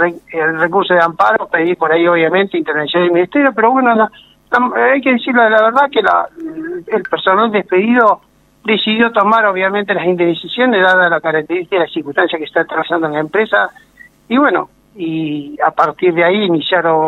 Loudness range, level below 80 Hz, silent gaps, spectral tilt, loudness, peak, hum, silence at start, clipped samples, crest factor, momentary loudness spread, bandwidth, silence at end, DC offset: 4 LU; -58 dBFS; none; -7 dB/octave; -13 LUFS; 0 dBFS; none; 0 s; under 0.1%; 14 dB; 8 LU; 6.8 kHz; 0 s; under 0.1%